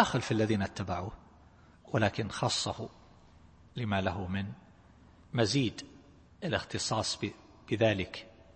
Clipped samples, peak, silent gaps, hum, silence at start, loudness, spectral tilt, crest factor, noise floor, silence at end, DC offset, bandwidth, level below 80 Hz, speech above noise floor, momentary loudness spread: under 0.1%; -10 dBFS; none; none; 0 s; -33 LUFS; -5 dB/octave; 24 dB; -58 dBFS; 0.25 s; under 0.1%; 8.8 kHz; -58 dBFS; 27 dB; 16 LU